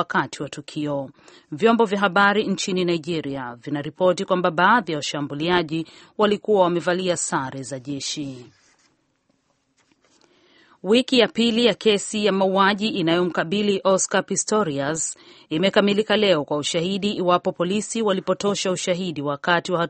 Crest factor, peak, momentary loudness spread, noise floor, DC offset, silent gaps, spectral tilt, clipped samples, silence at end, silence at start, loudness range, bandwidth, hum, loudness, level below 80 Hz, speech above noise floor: 22 dB; 0 dBFS; 11 LU; -68 dBFS; under 0.1%; none; -4 dB/octave; under 0.1%; 0 s; 0 s; 6 LU; 8.8 kHz; none; -21 LUFS; -62 dBFS; 46 dB